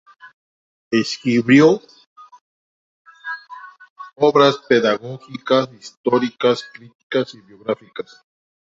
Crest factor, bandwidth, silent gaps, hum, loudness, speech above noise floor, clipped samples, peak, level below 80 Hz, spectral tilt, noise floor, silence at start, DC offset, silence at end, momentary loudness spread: 18 dB; 7.8 kHz; 0.34-0.91 s, 2.06-2.16 s, 2.41-3.05 s, 3.90-3.96 s, 5.97-6.04 s, 6.95-7.10 s; none; -18 LUFS; 22 dB; under 0.1%; -2 dBFS; -64 dBFS; -5.5 dB/octave; -40 dBFS; 0.25 s; under 0.1%; 0.65 s; 21 LU